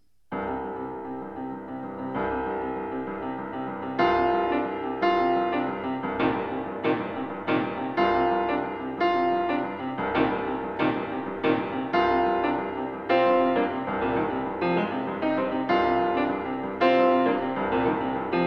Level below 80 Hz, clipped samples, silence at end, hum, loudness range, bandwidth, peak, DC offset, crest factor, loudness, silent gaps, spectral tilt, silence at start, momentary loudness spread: -54 dBFS; under 0.1%; 0 s; none; 4 LU; 6.2 kHz; -8 dBFS; 0.1%; 18 dB; -26 LUFS; none; -8 dB/octave; 0.3 s; 10 LU